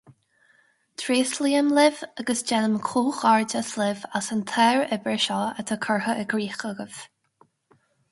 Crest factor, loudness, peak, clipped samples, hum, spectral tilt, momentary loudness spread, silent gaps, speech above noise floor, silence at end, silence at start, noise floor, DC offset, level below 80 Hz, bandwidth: 20 dB; -24 LUFS; -6 dBFS; under 0.1%; none; -3.5 dB/octave; 12 LU; none; 40 dB; 1.05 s; 1 s; -64 dBFS; under 0.1%; -72 dBFS; 11.5 kHz